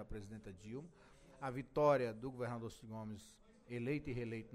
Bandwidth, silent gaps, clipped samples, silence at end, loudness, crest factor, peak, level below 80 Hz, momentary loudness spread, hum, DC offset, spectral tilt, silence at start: 14 kHz; none; under 0.1%; 0 s; -42 LUFS; 22 dB; -22 dBFS; -62 dBFS; 19 LU; none; under 0.1%; -7 dB/octave; 0 s